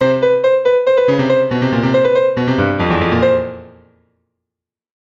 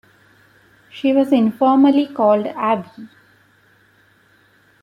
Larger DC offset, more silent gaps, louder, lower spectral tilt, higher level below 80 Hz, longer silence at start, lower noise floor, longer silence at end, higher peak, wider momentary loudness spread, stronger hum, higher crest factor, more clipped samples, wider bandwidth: neither; neither; about the same, -14 LUFS vs -16 LUFS; about the same, -7.5 dB/octave vs -7.5 dB/octave; first, -42 dBFS vs -68 dBFS; second, 0 s vs 0.95 s; first, -84 dBFS vs -55 dBFS; second, 1.35 s vs 1.75 s; about the same, -2 dBFS vs -4 dBFS; second, 3 LU vs 9 LU; neither; about the same, 12 dB vs 16 dB; neither; first, 7.4 kHz vs 5.4 kHz